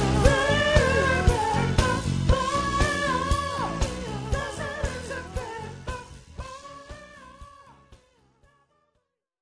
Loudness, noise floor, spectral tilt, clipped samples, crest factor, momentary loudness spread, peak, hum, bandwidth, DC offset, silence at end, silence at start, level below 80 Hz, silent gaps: -25 LUFS; -76 dBFS; -5 dB/octave; under 0.1%; 22 dB; 21 LU; -4 dBFS; none; 11 kHz; under 0.1%; 1.45 s; 0 s; -34 dBFS; none